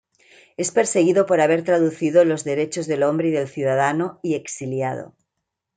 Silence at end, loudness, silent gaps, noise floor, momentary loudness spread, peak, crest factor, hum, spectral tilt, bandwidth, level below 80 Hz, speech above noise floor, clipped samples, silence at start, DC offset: 0.7 s; -20 LUFS; none; -80 dBFS; 9 LU; -4 dBFS; 16 dB; none; -5.5 dB/octave; 9.4 kHz; -70 dBFS; 60 dB; under 0.1%; 0.6 s; under 0.1%